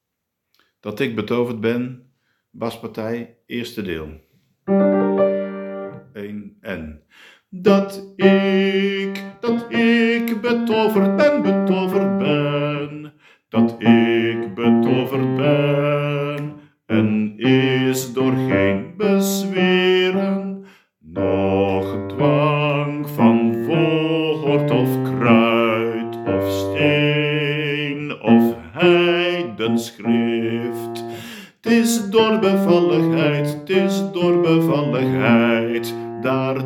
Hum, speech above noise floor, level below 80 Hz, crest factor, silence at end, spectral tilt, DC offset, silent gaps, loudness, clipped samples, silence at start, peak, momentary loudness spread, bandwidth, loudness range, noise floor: none; 60 dB; -58 dBFS; 18 dB; 0 s; -6 dB/octave; under 0.1%; none; -18 LUFS; under 0.1%; 0.85 s; 0 dBFS; 14 LU; 16.5 kHz; 5 LU; -78 dBFS